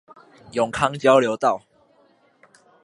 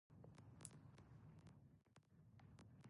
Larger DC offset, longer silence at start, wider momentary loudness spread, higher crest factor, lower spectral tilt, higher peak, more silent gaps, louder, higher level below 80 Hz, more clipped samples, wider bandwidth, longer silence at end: neither; first, 0.55 s vs 0.1 s; first, 12 LU vs 7 LU; second, 22 dB vs 32 dB; about the same, -5 dB/octave vs -5 dB/octave; first, -2 dBFS vs -34 dBFS; neither; first, -20 LUFS vs -65 LUFS; first, -58 dBFS vs -78 dBFS; neither; about the same, 11.5 kHz vs 11 kHz; first, 1.25 s vs 0 s